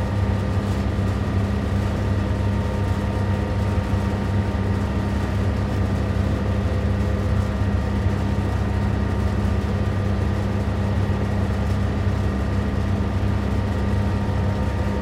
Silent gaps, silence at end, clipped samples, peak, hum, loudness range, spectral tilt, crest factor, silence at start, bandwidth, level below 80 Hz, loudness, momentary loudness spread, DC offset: none; 0 s; under 0.1%; -10 dBFS; none; 0 LU; -8 dB/octave; 12 dB; 0 s; 11 kHz; -28 dBFS; -23 LUFS; 1 LU; under 0.1%